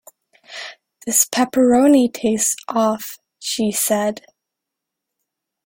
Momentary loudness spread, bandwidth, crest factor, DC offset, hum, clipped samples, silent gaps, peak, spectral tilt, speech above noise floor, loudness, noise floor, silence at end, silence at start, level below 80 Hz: 19 LU; 17 kHz; 18 dB; under 0.1%; none; under 0.1%; none; -2 dBFS; -3 dB/octave; 65 dB; -17 LUFS; -82 dBFS; 1.5 s; 0.5 s; -60 dBFS